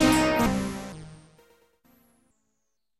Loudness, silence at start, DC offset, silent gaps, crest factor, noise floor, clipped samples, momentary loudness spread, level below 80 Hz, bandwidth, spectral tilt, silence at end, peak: -25 LUFS; 0 s; under 0.1%; none; 20 dB; -80 dBFS; under 0.1%; 23 LU; -46 dBFS; 15.5 kHz; -4.5 dB/octave; 1.85 s; -8 dBFS